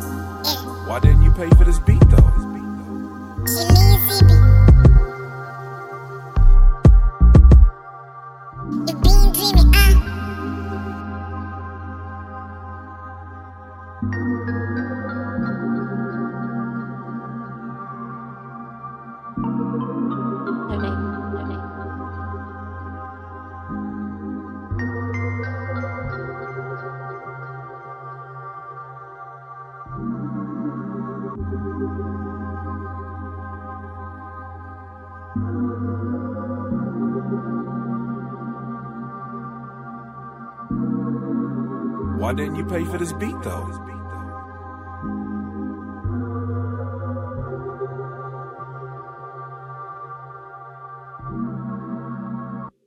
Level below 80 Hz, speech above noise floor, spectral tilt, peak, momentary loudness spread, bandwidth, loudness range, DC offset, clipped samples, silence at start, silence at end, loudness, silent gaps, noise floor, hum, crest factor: -22 dBFS; 26 dB; -6.5 dB/octave; 0 dBFS; 22 LU; 17 kHz; 17 LU; under 0.1%; under 0.1%; 0 s; 0.2 s; -20 LUFS; none; -39 dBFS; none; 18 dB